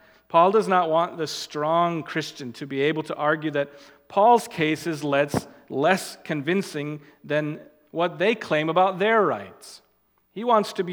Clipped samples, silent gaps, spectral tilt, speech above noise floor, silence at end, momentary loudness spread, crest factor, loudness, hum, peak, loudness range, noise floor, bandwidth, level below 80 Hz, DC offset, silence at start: under 0.1%; none; -5 dB/octave; 43 dB; 0 s; 14 LU; 20 dB; -23 LUFS; none; -4 dBFS; 3 LU; -66 dBFS; 20 kHz; -66 dBFS; under 0.1%; 0.3 s